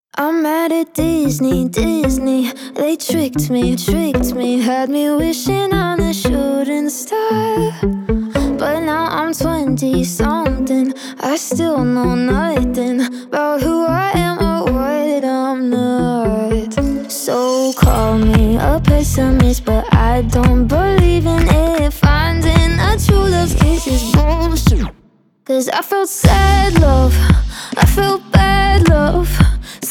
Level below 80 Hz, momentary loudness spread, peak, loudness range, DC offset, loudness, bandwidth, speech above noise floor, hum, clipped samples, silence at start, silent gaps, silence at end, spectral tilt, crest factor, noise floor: -20 dBFS; 6 LU; 0 dBFS; 4 LU; under 0.1%; -15 LUFS; 18.5 kHz; 38 dB; none; under 0.1%; 0.15 s; none; 0 s; -6 dB/octave; 14 dB; -51 dBFS